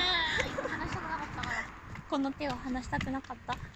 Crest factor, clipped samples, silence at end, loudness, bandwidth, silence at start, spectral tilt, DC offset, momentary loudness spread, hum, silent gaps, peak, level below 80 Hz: 20 dB; under 0.1%; 0 s; -34 LUFS; 14 kHz; 0 s; -4 dB/octave; under 0.1%; 10 LU; none; none; -16 dBFS; -50 dBFS